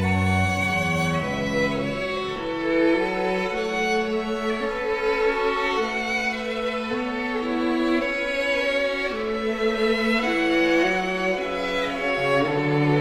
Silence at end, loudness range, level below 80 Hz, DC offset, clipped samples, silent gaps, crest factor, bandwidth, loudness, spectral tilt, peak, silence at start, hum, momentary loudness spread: 0 s; 2 LU; -46 dBFS; under 0.1%; under 0.1%; none; 14 dB; 15.5 kHz; -23 LUFS; -5.5 dB/octave; -10 dBFS; 0 s; none; 5 LU